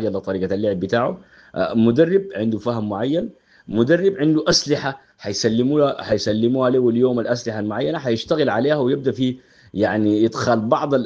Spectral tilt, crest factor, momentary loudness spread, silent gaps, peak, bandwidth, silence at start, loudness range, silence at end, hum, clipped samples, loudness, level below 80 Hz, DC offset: -5.5 dB/octave; 18 dB; 8 LU; none; -2 dBFS; 8 kHz; 0 s; 2 LU; 0 s; none; under 0.1%; -19 LUFS; -54 dBFS; under 0.1%